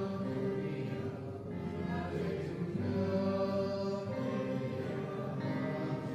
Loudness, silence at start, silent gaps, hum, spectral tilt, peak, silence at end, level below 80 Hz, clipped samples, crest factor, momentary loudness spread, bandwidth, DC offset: -37 LUFS; 0 s; none; none; -8.5 dB/octave; -22 dBFS; 0 s; -58 dBFS; under 0.1%; 14 dB; 6 LU; 12 kHz; under 0.1%